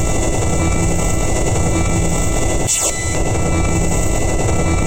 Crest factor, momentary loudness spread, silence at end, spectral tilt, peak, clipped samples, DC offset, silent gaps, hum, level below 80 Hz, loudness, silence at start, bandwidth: 10 dB; 3 LU; 0 s; -4.5 dB/octave; -4 dBFS; under 0.1%; under 0.1%; none; none; -20 dBFS; -17 LUFS; 0 s; 16.5 kHz